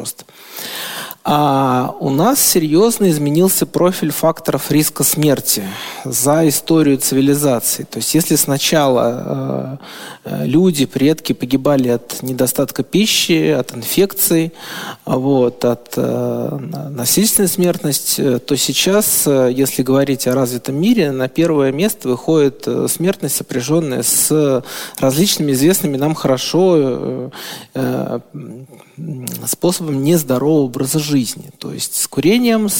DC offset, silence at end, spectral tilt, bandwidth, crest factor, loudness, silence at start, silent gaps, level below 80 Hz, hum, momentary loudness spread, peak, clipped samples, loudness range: under 0.1%; 0 s; -4.5 dB/octave; 17 kHz; 16 dB; -15 LUFS; 0 s; none; -52 dBFS; none; 12 LU; 0 dBFS; under 0.1%; 4 LU